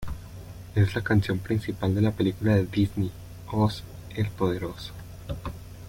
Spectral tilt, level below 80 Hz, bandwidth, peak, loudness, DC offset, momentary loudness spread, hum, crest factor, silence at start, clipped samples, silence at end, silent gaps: -7.5 dB/octave; -46 dBFS; 16.5 kHz; -10 dBFS; -27 LUFS; under 0.1%; 16 LU; none; 16 dB; 0 s; under 0.1%; 0 s; none